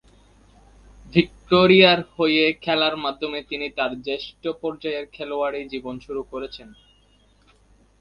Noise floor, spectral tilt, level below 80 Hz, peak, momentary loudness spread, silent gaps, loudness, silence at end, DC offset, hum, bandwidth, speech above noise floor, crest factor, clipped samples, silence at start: -58 dBFS; -7 dB/octave; -54 dBFS; 0 dBFS; 17 LU; none; -21 LUFS; 1.3 s; under 0.1%; none; 6.8 kHz; 36 dB; 22 dB; under 0.1%; 1.05 s